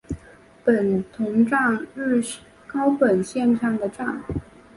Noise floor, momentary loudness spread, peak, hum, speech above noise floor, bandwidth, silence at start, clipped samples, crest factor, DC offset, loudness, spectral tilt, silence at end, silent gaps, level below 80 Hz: -49 dBFS; 13 LU; -4 dBFS; none; 28 dB; 11.5 kHz; 0.1 s; under 0.1%; 18 dB; under 0.1%; -22 LUFS; -6.5 dB/octave; 0.35 s; none; -48 dBFS